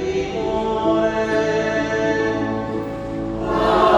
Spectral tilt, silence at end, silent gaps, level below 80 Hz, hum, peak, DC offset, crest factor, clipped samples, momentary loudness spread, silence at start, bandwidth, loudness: -6 dB/octave; 0 s; none; -40 dBFS; none; -2 dBFS; under 0.1%; 18 dB; under 0.1%; 8 LU; 0 s; 11.5 kHz; -21 LUFS